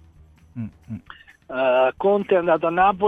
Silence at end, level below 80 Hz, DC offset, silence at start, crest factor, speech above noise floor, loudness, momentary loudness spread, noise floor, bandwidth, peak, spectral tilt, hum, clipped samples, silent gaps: 0 s; -54 dBFS; under 0.1%; 0.55 s; 16 dB; 31 dB; -20 LUFS; 19 LU; -51 dBFS; 4.5 kHz; -6 dBFS; -8 dB/octave; none; under 0.1%; none